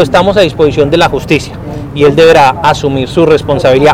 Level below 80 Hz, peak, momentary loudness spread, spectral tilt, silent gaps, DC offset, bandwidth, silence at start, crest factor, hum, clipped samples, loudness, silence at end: -30 dBFS; 0 dBFS; 8 LU; -6 dB/octave; none; under 0.1%; 15.5 kHz; 0 s; 8 dB; none; 2%; -8 LUFS; 0 s